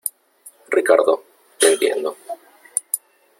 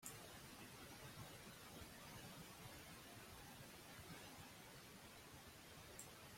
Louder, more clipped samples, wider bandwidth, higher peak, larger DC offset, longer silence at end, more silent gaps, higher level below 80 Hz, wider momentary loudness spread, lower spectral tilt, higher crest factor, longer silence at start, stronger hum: first, -19 LUFS vs -58 LUFS; neither; about the same, 16.5 kHz vs 16.5 kHz; first, 0 dBFS vs -36 dBFS; neither; first, 0.4 s vs 0 s; neither; about the same, -70 dBFS vs -74 dBFS; first, 16 LU vs 3 LU; second, -0.5 dB/octave vs -3 dB/octave; about the same, 20 dB vs 24 dB; about the same, 0.05 s vs 0 s; neither